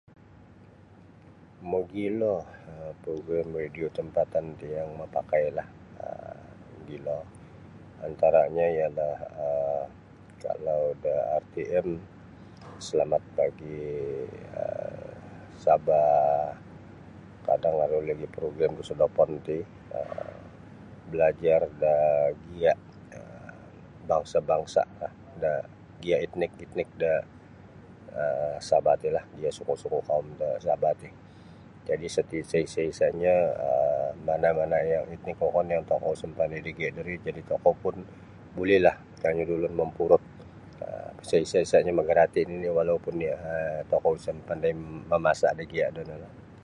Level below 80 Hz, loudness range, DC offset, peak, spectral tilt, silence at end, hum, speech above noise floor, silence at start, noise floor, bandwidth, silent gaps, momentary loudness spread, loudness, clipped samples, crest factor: -56 dBFS; 6 LU; under 0.1%; -6 dBFS; -6 dB/octave; 0.05 s; none; 26 dB; 1.6 s; -53 dBFS; 11 kHz; none; 20 LU; -28 LUFS; under 0.1%; 22 dB